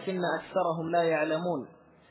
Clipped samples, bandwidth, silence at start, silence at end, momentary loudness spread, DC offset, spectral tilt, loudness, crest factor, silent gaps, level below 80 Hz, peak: under 0.1%; 4 kHz; 0 s; 0.4 s; 8 LU; under 0.1%; -10 dB/octave; -29 LUFS; 14 dB; none; -72 dBFS; -16 dBFS